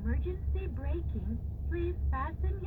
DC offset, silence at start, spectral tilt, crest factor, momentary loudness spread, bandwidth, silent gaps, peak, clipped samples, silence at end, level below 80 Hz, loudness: under 0.1%; 0 s; -10.5 dB/octave; 12 dB; 3 LU; 3.7 kHz; none; -22 dBFS; under 0.1%; 0 s; -34 dBFS; -35 LUFS